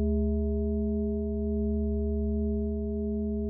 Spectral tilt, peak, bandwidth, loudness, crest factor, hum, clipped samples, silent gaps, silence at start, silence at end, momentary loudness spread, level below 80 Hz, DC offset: -17 dB/octave; -18 dBFS; 1 kHz; -30 LUFS; 10 dB; none; under 0.1%; none; 0 s; 0 s; 3 LU; -34 dBFS; under 0.1%